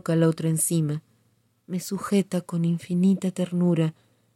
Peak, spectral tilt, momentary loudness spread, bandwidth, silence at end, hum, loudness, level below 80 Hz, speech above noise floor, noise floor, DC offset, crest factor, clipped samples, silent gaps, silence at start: -10 dBFS; -6.5 dB/octave; 8 LU; 15.5 kHz; 0.45 s; none; -25 LUFS; -70 dBFS; 43 dB; -66 dBFS; under 0.1%; 14 dB; under 0.1%; none; 0.05 s